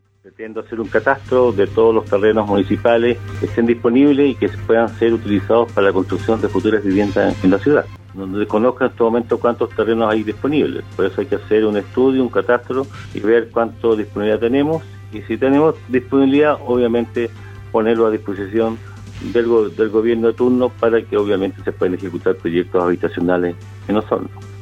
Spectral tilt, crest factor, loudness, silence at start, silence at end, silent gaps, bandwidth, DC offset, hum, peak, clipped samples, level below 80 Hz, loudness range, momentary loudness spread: -8 dB/octave; 16 dB; -17 LUFS; 0.4 s; 0 s; none; 8.6 kHz; under 0.1%; none; 0 dBFS; under 0.1%; -46 dBFS; 3 LU; 9 LU